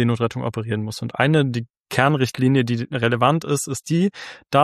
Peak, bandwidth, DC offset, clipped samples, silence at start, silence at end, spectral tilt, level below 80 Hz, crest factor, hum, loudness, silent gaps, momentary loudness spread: -2 dBFS; 14 kHz; under 0.1%; under 0.1%; 0 s; 0 s; -6 dB/octave; -58 dBFS; 18 dB; none; -21 LUFS; 1.70-1.74 s, 1.80-1.84 s; 8 LU